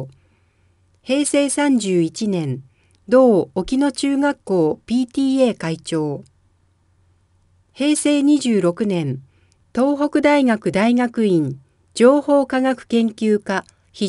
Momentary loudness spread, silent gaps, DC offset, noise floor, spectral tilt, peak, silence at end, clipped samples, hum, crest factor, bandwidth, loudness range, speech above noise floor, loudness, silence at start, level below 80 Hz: 12 LU; none; under 0.1%; -60 dBFS; -5.5 dB/octave; 0 dBFS; 0 s; under 0.1%; none; 18 dB; 11.5 kHz; 4 LU; 43 dB; -18 LUFS; 0 s; -54 dBFS